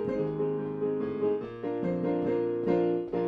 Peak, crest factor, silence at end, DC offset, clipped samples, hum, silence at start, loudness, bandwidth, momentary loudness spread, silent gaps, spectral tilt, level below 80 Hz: -14 dBFS; 14 dB; 0 s; under 0.1%; under 0.1%; none; 0 s; -30 LUFS; 5.4 kHz; 4 LU; none; -10 dB/octave; -62 dBFS